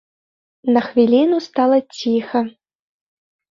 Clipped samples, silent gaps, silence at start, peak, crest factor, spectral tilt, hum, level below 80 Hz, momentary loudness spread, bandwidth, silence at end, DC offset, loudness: under 0.1%; none; 0.65 s; -2 dBFS; 16 dB; -6 dB/octave; none; -64 dBFS; 8 LU; 7.6 kHz; 1 s; under 0.1%; -17 LUFS